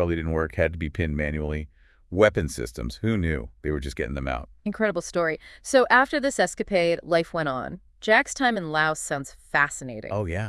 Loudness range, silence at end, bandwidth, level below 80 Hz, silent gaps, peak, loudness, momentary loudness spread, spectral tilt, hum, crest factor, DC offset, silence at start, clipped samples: 4 LU; 0 s; 12 kHz; -42 dBFS; none; -4 dBFS; -25 LUFS; 12 LU; -5 dB/octave; none; 22 dB; under 0.1%; 0 s; under 0.1%